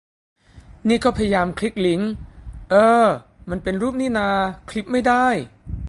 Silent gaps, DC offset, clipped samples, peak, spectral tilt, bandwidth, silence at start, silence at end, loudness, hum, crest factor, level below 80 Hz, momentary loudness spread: none; under 0.1%; under 0.1%; -4 dBFS; -6 dB/octave; 11.5 kHz; 0.55 s; 0 s; -20 LUFS; none; 18 dB; -40 dBFS; 14 LU